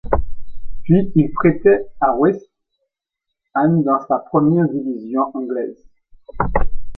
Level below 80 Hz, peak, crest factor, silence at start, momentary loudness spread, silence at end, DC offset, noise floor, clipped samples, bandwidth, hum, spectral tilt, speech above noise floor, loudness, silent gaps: -32 dBFS; 0 dBFS; 16 dB; 0.05 s; 10 LU; 0 s; under 0.1%; -80 dBFS; under 0.1%; 3.9 kHz; none; -11.5 dB/octave; 64 dB; -18 LUFS; none